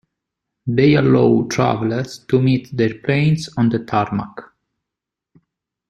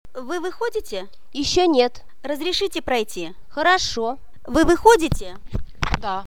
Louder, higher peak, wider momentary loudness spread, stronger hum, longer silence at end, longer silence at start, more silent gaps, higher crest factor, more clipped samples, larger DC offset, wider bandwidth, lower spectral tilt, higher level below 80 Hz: first, -17 LUFS vs -21 LUFS; about the same, -2 dBFS vs 0 dBFS; second, 10 LU vs 18 LU; neither; first, 1.45 s vs 0.05 s; first, 0.65 s vs 0.15 s; neither; about the same, 16 dB vs 20 dB; neither; second, under 0.1% vs 2%; second, 11.5 kHz vs 18 kHz; first, -7 dB/octave vs -4 dB/octave; second, -52 dBFS vs -36 dBFS